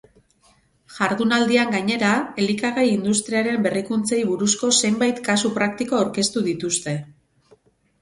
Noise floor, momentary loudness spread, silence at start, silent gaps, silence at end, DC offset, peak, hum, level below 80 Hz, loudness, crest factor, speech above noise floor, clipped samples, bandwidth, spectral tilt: -59 dBFS; 6 LU; 0.9 s; none; 0.9 s; under 0.1%; -4 dBFS; none; -60 dBFS; -20 LUFS; 18 dB; 39 dB; under 0.1%; 11.5 kHz; -3.5 dB/octave